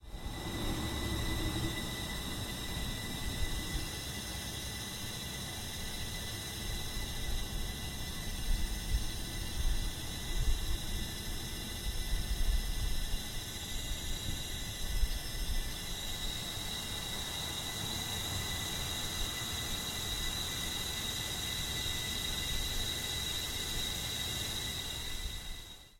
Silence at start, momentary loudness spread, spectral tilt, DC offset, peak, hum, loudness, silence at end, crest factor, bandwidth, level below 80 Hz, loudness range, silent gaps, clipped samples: 0 s; 5 LU; -2.5 dB/octave; under 0.1%; -18 dBFS; none; -37 LUFS; 0 s; 20 dB; 16.5 kHz; -40 dBFS; 4 LU; none; under 0.1%